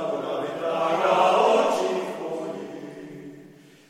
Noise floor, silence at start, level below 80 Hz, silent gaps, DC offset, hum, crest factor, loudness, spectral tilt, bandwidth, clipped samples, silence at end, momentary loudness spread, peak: -49 dBFS; 0 s; -74 dBFS; none; under 0.1%; none; 18 dB; -23 LUFS; -4.5 dB/octave; 15 kHz; under 0.1%; 0.4 s; 21 LU; -6 dBFS